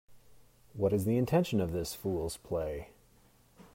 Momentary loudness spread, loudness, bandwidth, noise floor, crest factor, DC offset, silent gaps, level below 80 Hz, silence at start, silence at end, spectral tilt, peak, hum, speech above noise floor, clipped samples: 13 LU; -33 LUFS; 16 kHz; -64 dBFS; 18 dB; under 0.1%; none; -56 dBFS; 0.1 s; 0.1 s; -6.5 dB/octave; -16 dBFS; none; 32 dB; under 0.1%